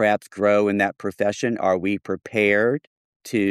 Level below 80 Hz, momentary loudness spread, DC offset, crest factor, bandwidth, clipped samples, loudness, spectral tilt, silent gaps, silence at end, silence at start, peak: -64 dBFS; 8 LU; under 0.1%; 16 dB; 14.5 kHz; under 0.1%; -22 LUFS; -5.5 dB/octave; 2.87-3.20 s; 0 s; 0 s; -6 dBFS